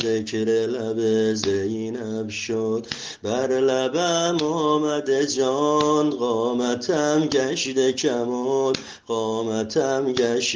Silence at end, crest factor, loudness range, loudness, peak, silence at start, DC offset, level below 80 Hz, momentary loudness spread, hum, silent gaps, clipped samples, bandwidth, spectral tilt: 0 s; 18 dB; 3 LU; -23 LUFS; -4 dBFS; 0 s; under 0.1%; -64 dBFS; 6 LU; none; none; under 0.1%; 10 kHz; -4 dB/octave